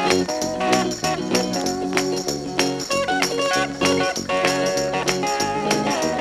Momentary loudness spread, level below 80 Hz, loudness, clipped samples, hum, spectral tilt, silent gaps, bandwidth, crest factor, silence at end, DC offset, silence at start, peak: 3 LU; -50 dBFS; -21 LUFS; under 0.1%; none; -3.5 dB/octave; none; 16.5 kHz; 20 dB; 0 s; under 0.1%; 0 s; -2 dBFS